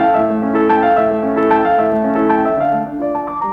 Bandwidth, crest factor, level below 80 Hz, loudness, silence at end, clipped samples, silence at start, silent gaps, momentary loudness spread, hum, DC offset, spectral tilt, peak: 5.2 kHz; 12 dB; -46 dBFS; -15 LUFS; 0 s; under 0.1%; 0 s; none; 7 LU; none; under 0.1%; -8.5 dB/octave; -2 dBFS